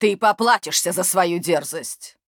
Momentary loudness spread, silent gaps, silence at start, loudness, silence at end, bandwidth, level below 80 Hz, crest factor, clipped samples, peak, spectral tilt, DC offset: 12 LU; none; 0 s; -19 LUFS; 0.25 s; over 20 kHz; -72 dBFS; 16 dB; under 0.1%; -4 dBFS; -2.5 dB/octave; under 0.1%